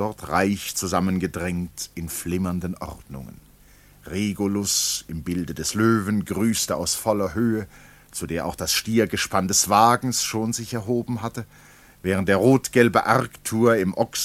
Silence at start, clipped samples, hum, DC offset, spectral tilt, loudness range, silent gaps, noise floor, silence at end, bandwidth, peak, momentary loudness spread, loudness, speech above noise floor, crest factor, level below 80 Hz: 0 s; under 0.1%; none; under 0.1%; -4 dB/octave; 6 LU; none; -52 dBFS; 0 s; 16.5 kHz; -2 dBFS; 14 LU; -22 LUFS; 29 dB; 22 dB; -48 dBFS